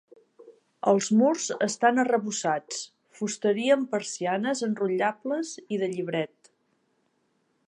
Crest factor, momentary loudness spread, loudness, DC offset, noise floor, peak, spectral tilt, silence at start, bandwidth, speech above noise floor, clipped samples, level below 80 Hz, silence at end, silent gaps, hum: 20 dB; 10 LU; -26 LUFS; under 0.1%; -72 dBFS; -8 dBFS; -4 dB/octave; 0.4 s; 11 kHz; 46 dB; under 0.1%; -82 dBFS; 1.45 s; none; none